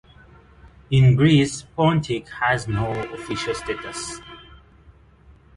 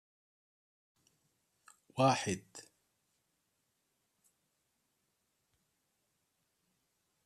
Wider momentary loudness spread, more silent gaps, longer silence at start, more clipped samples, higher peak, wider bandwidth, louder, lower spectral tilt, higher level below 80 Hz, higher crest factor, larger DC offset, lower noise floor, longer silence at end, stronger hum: second, 15 LU vs 23 LU; neither; second, 0.9 s vs 1.95 s; neither; first, -6 dBFS vs -16 dBFS; second, 11.5 kHz vs 14 kHz; first, -21 LUFS vs -33 LUFS; first, -6 dB/octave vs -4.5 dB/octave; first, -46 dBFS vs -82 dBFS; second, 18 dB vs 26 dB; neither; second, -51 dBFS vs -82 dBFS; second, 1.15 s vs 4.65 s; neither